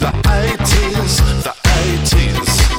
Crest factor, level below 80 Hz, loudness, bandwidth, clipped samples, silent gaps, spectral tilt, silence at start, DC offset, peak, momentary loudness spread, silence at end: 12 dB; -16 dBFS; -14 LUFS; 17 kHz; under 0.1%; none; -4 dB/octave; 0 s; under 0.1%; -2 dBFS; 1 LU; 0 s